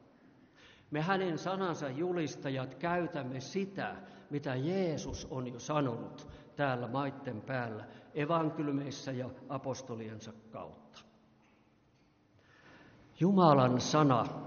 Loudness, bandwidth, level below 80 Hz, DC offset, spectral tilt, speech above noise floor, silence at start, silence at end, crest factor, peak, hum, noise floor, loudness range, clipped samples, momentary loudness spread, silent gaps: -34 LUFS; 6.8 kHz; -64 dBFS; under 0.1%; -5.5 dB/octave; 34 dB; 0.65 s; 0 s; 22 dB; -12 dBFS; none; -68 dBFS; 12 LU; under 0.1%; 17 LU; none